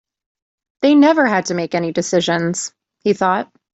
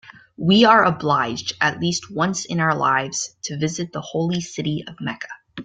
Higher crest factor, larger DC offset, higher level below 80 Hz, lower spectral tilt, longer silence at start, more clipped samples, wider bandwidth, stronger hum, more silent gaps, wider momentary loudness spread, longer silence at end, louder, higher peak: second, 14 dB vs 20 dB; neither; about the same, -62 dBFS vs -58 dBFS; about the same, -4.5 dB/octave vs -4.5 dB/octave; first, 0.8 s vs 0.05 s; neither; second, 8.2 kHz vs 9.4 kHz; neither; neither; second, 11 LU vs 14 LU; first, 0.3 s vs 0 s; first, -16 LUFS vs -20 LUFS; about the same, -2 dBFS vs -2 dBFS